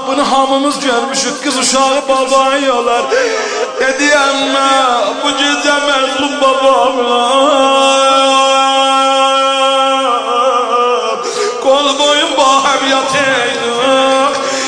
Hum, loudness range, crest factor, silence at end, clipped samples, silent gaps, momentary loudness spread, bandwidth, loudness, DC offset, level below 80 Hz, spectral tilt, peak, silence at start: none; 2 LU; 12 dB; 0 s; under 0.1%; none; 5 LU; 10.5 kHz; -10 LUFS; under 0.1%; -52 dBFS; -1 dB/octave; 0 dBFS; 0 s